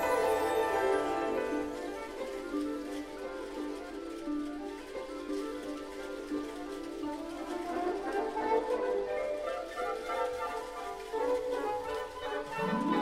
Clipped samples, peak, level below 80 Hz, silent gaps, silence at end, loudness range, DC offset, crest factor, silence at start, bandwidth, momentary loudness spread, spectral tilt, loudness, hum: under 0.1%; -18 dBFS; -58 dBFS; none; 0 s; 5 LU; under 0.1%; 16 dB; 0 s; 16 kHz; 11 LU; -4.5 dB/octave; -35 LUFS; none